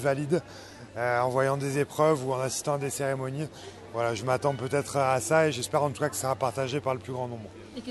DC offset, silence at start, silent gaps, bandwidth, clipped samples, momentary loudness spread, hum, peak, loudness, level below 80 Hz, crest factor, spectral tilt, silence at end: under 0.1%; 0 s; none; 12.5 kHz; under 0.1%; 13 LU; none; -10 dBFS; -28 LUFS; -60 dBFS; 18 dB; -5 dB/octave; 0 s